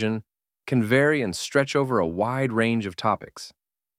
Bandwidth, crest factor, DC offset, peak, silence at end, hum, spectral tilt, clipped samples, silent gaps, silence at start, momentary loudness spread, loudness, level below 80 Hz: 15.5 kHz; 18 dB; under 0.1%; -6 dBFS; 0.5 s; none; -5.5 dB/octave; under 0.1%; none; 0 s; 18 LU; -24 LUFS; -60 dBFS